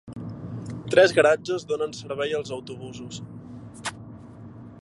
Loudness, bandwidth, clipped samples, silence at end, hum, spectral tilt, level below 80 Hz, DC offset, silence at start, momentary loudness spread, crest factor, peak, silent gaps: -24 LUFS; 11.5 kHz; under 0.1%; 0.05 s; none; -4.5 dB/octave; -58 dBFS; under 0.1%; 0.05 s; 25 LU; 22 dB; -4 dBFS; none